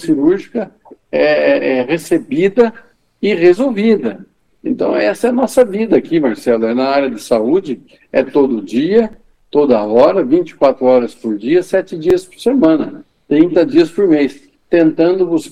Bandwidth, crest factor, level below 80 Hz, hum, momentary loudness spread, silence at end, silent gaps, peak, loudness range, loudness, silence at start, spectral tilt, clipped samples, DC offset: 13.5 kHz; 14 dB; -50 dBFS; none; 8 LU; 0 s; none; 0 dBFS; 2 LU; -13 LUFS; 0 s; -6.5 dB/octave; under 0.1%; under 0.1%